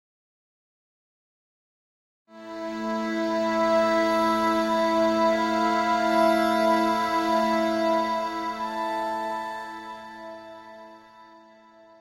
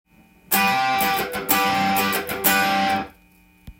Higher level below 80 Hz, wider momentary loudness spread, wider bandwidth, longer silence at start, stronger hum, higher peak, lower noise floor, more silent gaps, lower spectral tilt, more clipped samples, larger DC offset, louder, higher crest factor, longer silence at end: second, -60 dBFS vs -54 dBFS; first, 18 LU vs 6 LU; about the same, 16 kHz vs 17 kHz; first, 2.35 s vs 0.5 s; neither; second, -10 dBFS vs -2 dBFS; about the same, -52 dBFS vs -54 dBFS; neither; first, -4.5 dB/octave vs -2.5 dB/octave; neither; neither; second, -24 LUFS vs -20 LUFS; about the same, 16 dB vs 20 dB; first, 0.75 s vs 0.1 s